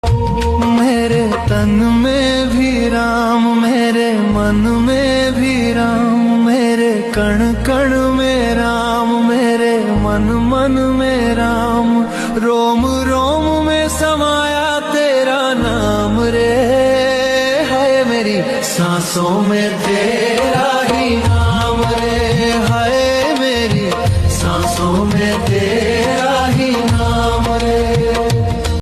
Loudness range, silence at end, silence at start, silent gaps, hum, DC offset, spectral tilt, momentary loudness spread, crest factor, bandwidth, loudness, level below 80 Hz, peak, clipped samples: 1 LU; 0 s; 0.05 s; none; none; under 0.1%; -5.5 dB/octave; 2 LU; 10 dB; 14 kHz; -14 LUFS; -28 dBFS; -2 dBFS; under 0.1%